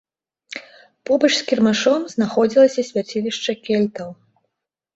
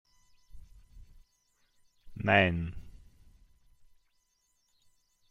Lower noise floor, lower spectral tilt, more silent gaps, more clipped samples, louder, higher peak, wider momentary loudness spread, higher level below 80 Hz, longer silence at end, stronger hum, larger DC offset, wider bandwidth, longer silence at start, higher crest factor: first, -79 dBFS vs -75 dBFS; second, -4.5 dB/octave vs -7 dB/octave; neither; neither; first, -18 LUFS vs -28 LUFS; first, -2 dBFS vs -10 dBFS; second, 19 LU vs 27 LU; second, -64 dBFS vs -56 dBFS; second, 0.85 s vs 2.4 s; neither; neither; about the same, 8 kHz vs 7.6 kHz; about the same, 0.5 s vs 0.55 s; second, 18 dB vs 26 dB